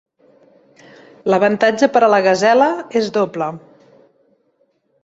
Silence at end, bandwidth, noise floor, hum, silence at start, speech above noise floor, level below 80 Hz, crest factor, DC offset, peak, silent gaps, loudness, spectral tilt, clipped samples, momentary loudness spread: 1.45 s; 8 kHz; -62 dBFS; none; 1.25 s; 48 dB; -64 dBFS; 16 dB; under 0.1%; -2 dBFS; none; -15 LUFS; -5 dB/octave; under 0.1%; 12 LU